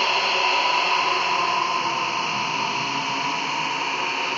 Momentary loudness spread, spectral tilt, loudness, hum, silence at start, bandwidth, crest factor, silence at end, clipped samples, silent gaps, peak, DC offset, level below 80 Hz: 5 LU; -1.5 dB/octave; -21 LUFS; none; 0 s; 8 kHz; 14 dB; 0 s; under 0.1%; none; -8 dBFS; under 0.1%; -70 dBFS